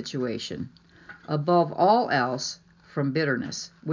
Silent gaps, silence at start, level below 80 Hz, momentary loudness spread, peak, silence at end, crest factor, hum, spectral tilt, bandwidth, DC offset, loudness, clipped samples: none; 0 s; -64 dBFS; 16 LU; -8 dBFS; 0 s; 18 dB; none; -5 dB/octave; 7.6 kHz; under 0.1%; -26 LUFS; under 0.1%